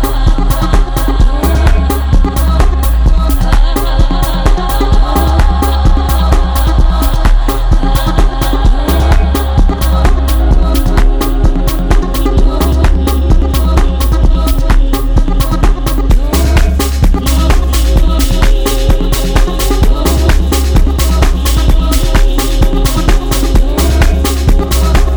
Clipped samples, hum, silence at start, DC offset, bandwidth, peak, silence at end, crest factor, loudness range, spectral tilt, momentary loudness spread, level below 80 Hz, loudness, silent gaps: 0.2%; none; 0 s; under 0.1%; over 20 kHz; 0 dBFS; 0 s; 8 dB; 1 LU; -5.5 dB/octave; 2 LU; -8 dBFS; -12 LUFS; none